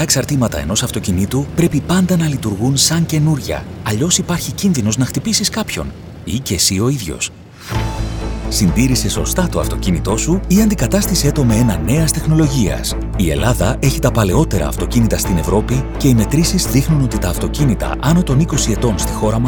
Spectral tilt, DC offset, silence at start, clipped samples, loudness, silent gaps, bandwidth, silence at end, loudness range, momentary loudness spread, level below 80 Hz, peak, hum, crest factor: -5 dB/octave; under 0.1%; 0 s; under 0.1%; -15 LUFS; none; over 20 kHz; 0 s; 3 LU; 8 LU; -24 dBFS; 0 dBFS; none; 14 dB